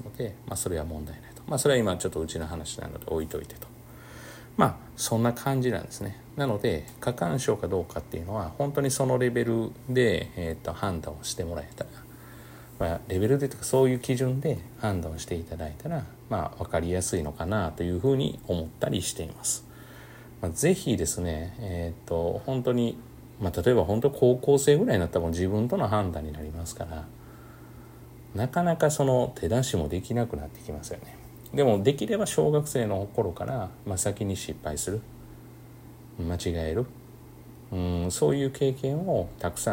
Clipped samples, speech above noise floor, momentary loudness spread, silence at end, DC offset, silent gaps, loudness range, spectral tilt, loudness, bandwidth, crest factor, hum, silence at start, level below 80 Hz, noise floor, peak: under 0.1%; 20 dB; 21 LU; 0 s; under 0.1%; none; 6 LU; -5.5 dB/octave; -28 LUFS; 16.5 kHz; 20 dB; none; 0 s; -50 dBFS; -47 dBFS; -8 dBFS